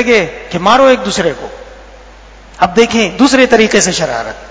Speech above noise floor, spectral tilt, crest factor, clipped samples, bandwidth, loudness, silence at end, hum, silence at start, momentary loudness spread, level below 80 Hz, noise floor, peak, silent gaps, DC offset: 25 dB; -3.5 dB/octave; 12 dB; 0.8%; 8 kHz; -10 LUFS; 0 s; none; 0 s; 11 LU; -38 dBFS; -36 dBFS; 0 dBFS; none; under 0.1%